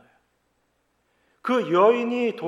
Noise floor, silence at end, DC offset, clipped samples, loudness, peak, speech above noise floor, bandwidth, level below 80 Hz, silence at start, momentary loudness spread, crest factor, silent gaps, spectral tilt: -70 dBFS; 0 s; under 0.1%; under 0.1%; -21 LUFS; -6 dBFS; 49 dB; 10 kHz; -80 dBFS; 1.45 s; 8 LU; 18 dB; none; -6.5 dB/octave